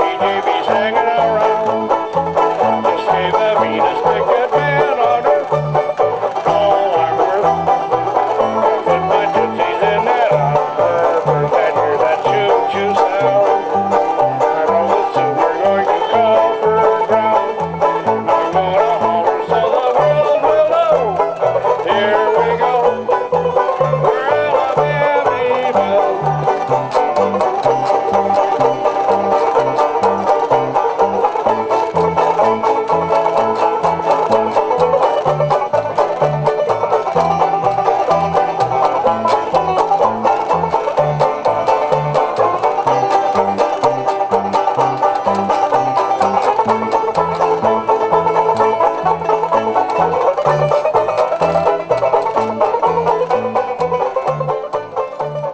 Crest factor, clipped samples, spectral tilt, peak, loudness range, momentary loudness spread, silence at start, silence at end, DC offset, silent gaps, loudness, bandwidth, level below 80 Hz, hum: 14 dB; under 0.1%; -6 dB/octave; 0 dBFS; 1 LU; 3 LU; 0 s; 0 s; under 0.1%; none; -15 LUFS; 8 kHz; -48 dBFS; none